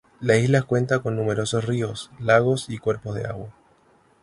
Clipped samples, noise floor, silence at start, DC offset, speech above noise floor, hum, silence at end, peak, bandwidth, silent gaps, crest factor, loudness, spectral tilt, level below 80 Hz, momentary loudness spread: under 0.1%; -59 dBFS; 0.2 s; under 0.1%; 37 dB; none; 0.7 s; -4 dBFS; 11.5 kHz; none; 20 dB; -23 LUFS; -6 dB/octave; -54 dBFS; 12 LU